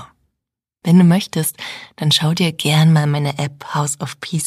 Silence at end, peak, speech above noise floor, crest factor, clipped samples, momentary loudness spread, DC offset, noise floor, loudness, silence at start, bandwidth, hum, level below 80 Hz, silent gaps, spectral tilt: 0 s; -2 dBFS; 65 dB; 14 dB; under 0.1%; 13 LU; under 0.1%; -81 dBFS; -16 LUFS; 0 s; 15 kHz; none; -60 dBFS; none; -5 dB/octave